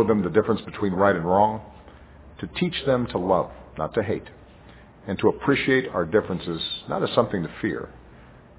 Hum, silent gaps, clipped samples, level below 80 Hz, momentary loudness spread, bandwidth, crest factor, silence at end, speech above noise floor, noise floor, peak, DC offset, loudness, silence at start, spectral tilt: none; none; under 0.1%; -48 dBFS; 12 LU; 4 kHz; 20 dB; 0.2 s; 25 dB; -48 dBFS; -4 dBFS; under 0.1%; -24 LUFS; 0 s; -10.5 dB/octave